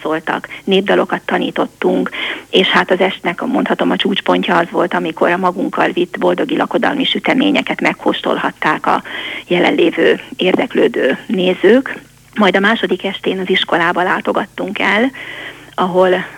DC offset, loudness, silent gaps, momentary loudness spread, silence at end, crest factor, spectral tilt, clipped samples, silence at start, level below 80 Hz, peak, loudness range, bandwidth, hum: under 0.1%; -14 LUFS; none; 7 LU; 0 s; 14 dB; -5.5 dB/octave; under 0.1%; 0 s; -56 dBFS; 0 dBFS; 1 LU; 16 kHz; none